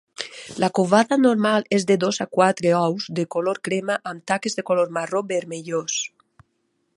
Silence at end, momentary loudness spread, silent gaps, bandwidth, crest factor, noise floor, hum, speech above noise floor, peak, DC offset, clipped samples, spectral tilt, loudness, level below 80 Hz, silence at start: 0.9 s; 9 LU; none; 11.5 kHz; 20 dB; -71 dBFS; none; 50 dB; -2 dBFS; under 0.1%; under 0.1%; -4.5 dB/octave; -21 LUFS; -68 dBFS; 0.2 s